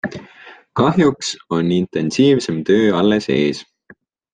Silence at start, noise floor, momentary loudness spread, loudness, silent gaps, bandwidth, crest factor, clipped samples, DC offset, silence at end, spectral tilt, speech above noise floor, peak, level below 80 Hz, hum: 0.05 s; -49 dBFS; 12 LU; -17 LUFS; none; 9.6 kHz; 16 dB; under 0.1%; under 0.1%; 0.7 s; -6 dB/octave; 34 dB; -2 dBFS; -54 dBFS; none